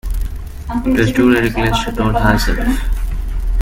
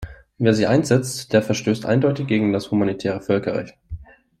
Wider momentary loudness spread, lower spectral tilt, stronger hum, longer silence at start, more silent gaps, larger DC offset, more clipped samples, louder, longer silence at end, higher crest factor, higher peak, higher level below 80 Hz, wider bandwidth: second, 12 LU vs 18 LU; about the same, -6 dB/octave vs -6 dB/octave; neither; about the same, 0.05 s vs 0 s; neither; neither; neither; first, -16 LUFS vs -20 LUFS; second, 0 s vs 0.35 s; about the same, 14 dB vs 18 dB; about the same, 0 dBFS vs -2 dBFS; first, -20 dBFS vs -46 dBFS; first, 16.5 kHz vs 14 kHz